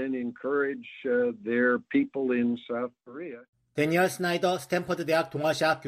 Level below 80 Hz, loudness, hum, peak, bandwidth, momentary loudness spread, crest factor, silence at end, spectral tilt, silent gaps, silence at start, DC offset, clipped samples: -70 dBFS; -28 LUFS; none; -12 dBFS; 14.5 kHz; 12 LU; 16 dB; 0 s; -5.5 dB/octave; 3.49-3.53 s; 0 s; under 0.1%; under 0.1%